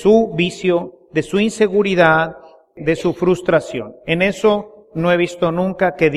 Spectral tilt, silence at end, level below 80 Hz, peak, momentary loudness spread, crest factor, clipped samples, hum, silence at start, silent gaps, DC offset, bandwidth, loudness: -6 dB/octave; 0 s; -48 dBFS; 0 dBFS; 10 LU; 16 dB; under 0.1%; none; 0 s; none; under 0.1%; 12 kHz; -17 LUFS